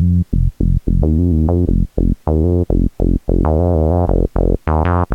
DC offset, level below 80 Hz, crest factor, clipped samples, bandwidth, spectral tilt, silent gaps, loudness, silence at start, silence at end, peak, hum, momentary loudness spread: under 0.1%; -18 dBFS; 12 dB; under 0.1%; 3.2 kHz; -11 dB/octave; none; -16 LUFS; 0 s; 0 s; -2 dBFS; none; 3 LU